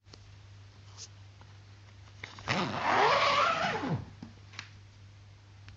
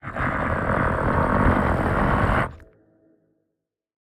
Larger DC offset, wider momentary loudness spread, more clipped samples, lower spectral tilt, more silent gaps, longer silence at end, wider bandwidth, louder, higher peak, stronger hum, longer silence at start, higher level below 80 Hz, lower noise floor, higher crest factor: neither; first, 25 LU vs 5 LU; neither; second, -4 dB/octave vs -8 dB/octave; neither; second, 0 s vs 1.45 s; second, 8 kHz vs 13 kHz; second, -29 LUFS vs -22 LUFS; second, -12 dBFS vs -6 dBFS; neither; first, 0.2 s vs 0.05 s; second, -62 dBFS vs -32 dBFS; second, -54 dBFS vs -80 dBFS; first, 22 dB vs 16 dB